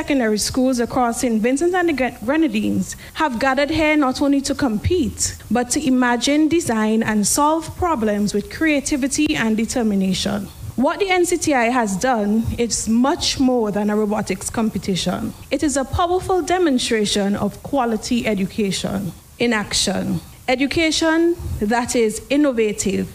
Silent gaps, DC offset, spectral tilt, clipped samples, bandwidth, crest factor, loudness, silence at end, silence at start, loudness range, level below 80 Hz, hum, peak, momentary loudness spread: none; under 0.1%; -4 dB/octave; under 0.1%; 15.5 kHz; 14 dB; -19 LUFS; 0 s; 0 s; 2 LU; -40 dBFS; none; -4 dBFS; 6 LU